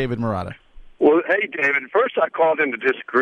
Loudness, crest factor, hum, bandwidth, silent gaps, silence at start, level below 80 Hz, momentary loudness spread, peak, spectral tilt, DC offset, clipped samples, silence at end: -19 LUFS; 16 dB; none; 7 kHz; none; 0 s; -48 dBFS; 7 LU; -4 dBFS; -7.5 dB/octave; under 0.1%; under 0.1%; 0 s